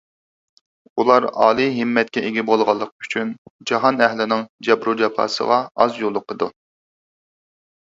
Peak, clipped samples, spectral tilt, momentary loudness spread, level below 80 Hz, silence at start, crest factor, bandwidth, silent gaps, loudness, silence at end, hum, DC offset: 0 dBFS; under 0.1%; -5 dB/octave; 9 LU; -64 dBFS; 0.95 s; 20 dB; 7.8 kHz; 2.92-2.99 s, 3.38-3.59 s, 4.50-4.58 s; -19 LUFS; 1.35 s; none; under 0.1%